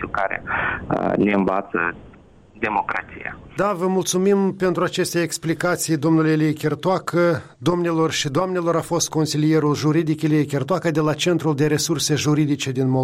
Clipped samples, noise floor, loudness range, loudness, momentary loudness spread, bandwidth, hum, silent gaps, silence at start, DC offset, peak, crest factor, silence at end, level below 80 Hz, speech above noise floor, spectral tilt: under 0.1%; -47 dBFS; 3 LU; -20 LUFS; 5 LU; 16 kHz; none; none; 0 s; under 0.1%; -6 dBFS; 14 dB; 0 s; -52 dBFS; 27 dB; -5 dB/octave